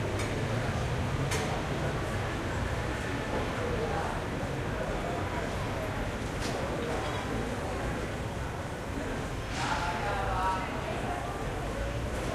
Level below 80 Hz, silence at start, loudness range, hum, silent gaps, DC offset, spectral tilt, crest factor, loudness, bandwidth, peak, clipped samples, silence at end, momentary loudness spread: -40 dBFS; 0 s; 2 LU; none; none; under 0.1%; -5.5 dB/octave; 14 dB; -33 LUFS; 15 kHz; -18 dBFS; under 0.1%; 0 s; 4 LU